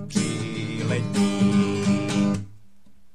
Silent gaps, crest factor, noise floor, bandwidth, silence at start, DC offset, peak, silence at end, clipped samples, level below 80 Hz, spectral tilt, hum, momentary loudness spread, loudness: none; 14 dB; -57 dBFS; 11.5 kHz; 0 s; 0.7%; -10 dBFS; 0.6 s; under 0.1%; -54 dBFS; -6 dB/octave; none; 8 LU; -24 LUFS